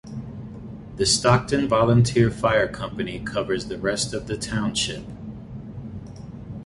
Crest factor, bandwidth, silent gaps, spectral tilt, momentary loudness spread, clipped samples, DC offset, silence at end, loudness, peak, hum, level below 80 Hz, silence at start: 20 dB; 11.5 kHz; none; -4.5 dB/octave; 20 LU; under 0.1%; under 0.1%; 0 s; -22 LUFS; -4 dBFS; none; -44 dBFS; 0.05 s